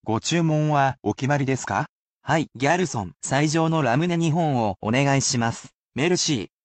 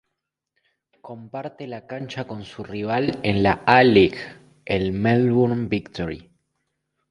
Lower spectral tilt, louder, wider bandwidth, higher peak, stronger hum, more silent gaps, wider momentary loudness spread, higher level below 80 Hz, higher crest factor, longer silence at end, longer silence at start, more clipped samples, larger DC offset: second, -5 dB/octave vs -7.5 dB/octave; about the same, -22 LUFS vs -20 LUFS; second, 9 kHz vs 10.5 kHz; second, -8 dBFS vs 0 dBFS; neither; first, 1.89-2.21 s, 5.74-5.89 s vs none; second, 7 LU vs 20 LU; second, -58 dBFS vs -48 dBFS; second, 14 dB vs 22 dB; second, 0.2 s vs 0.9 s; second, 0.05 s vs 1.05 s; neither; neither